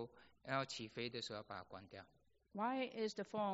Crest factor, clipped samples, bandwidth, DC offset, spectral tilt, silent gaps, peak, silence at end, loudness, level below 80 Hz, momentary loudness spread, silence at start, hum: 20 dB; under 0.1%; 7.6 kHz; under 0.1%; -3 dB/octave; none; -26 dBFS; 0 s; -45 LUFS; -82 dBFS; 14 LU; 0 s; none